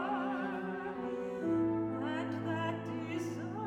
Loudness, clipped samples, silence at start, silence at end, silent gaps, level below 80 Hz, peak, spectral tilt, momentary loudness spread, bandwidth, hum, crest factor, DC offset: -37 LUFS; under 0.1%; 0 s; 0 s; none; -70 dBFS; -24 dBFS; -7 dB/octave; 6 LU; 10.5 kHz; none; 12 dB; under 0.1%